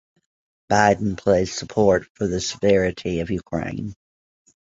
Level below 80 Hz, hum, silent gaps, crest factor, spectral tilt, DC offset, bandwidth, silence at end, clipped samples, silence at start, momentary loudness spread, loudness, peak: -44 dBFS; none; 2.10-2.15 s; 22 dB; -5 dB/octave; under 0.1%; 8 kHz; 0.85 s; under 0.1%; 0.7 s; 9 LU; -21 LUFS; 0 dBFS